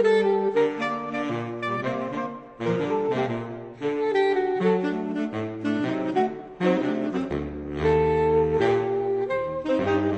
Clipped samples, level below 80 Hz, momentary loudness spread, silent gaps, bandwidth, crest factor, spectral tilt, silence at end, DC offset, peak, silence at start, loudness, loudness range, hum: under 0.1%; -48 dBFS; 9 LU; none; 8.6 kHz; 14 dB; -7.5 dB/octave; 0 s; under 0.1%; -10 dBFS; 0 s; -25 LUFS; 3 LU; none